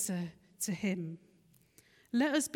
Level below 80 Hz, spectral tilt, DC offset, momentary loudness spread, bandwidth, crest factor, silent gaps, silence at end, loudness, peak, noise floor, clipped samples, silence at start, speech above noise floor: -76 dBFS; -4 dB/octave; under 0.1%; 14 LU; 17.5 kHz; 16 dB; none; 0 s; -36 LUFS; -20 dBFS; -67 dBFS; under 0.1%; 0 s; 33 dB